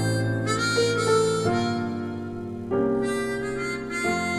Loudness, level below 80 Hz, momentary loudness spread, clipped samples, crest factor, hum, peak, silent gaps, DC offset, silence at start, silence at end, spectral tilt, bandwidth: -25 LUFS; -52 dBFS; 10 LU; under 0.1%; 14 dB; none; -12 dBFS; none; under 0.1%; 0 s; 0 s; -5 dB/octave; 14 kHz